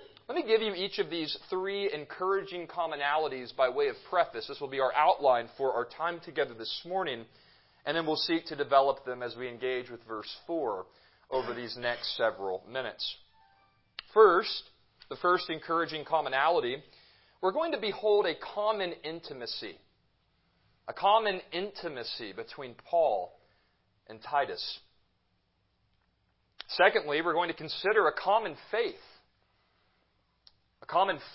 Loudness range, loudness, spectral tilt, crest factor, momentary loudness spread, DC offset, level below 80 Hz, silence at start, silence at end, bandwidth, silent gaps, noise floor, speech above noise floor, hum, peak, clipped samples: 5 LU; -30 LUFS; -7.5 dB/octave; 24 dB; 14 LU; under 0.1%; -72 dBFS; 0 s; 0 s; 5.8 kHz; none; -74 dBFS; 44 dB; none; -8 dBFS; under 0.1%